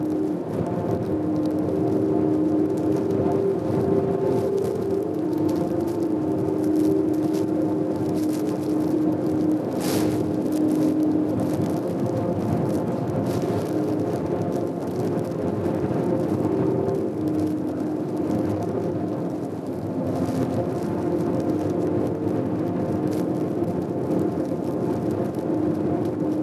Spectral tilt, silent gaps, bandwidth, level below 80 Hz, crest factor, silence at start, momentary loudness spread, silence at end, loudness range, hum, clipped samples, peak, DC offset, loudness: -8 dB/octave; none; 14 kHz; -50 dBFS; 14 dB; 0 s; 4 LU; 0 s; 3 LU; none; under 0.1%; -8 dBFS; under 0.1%; -24 LUFS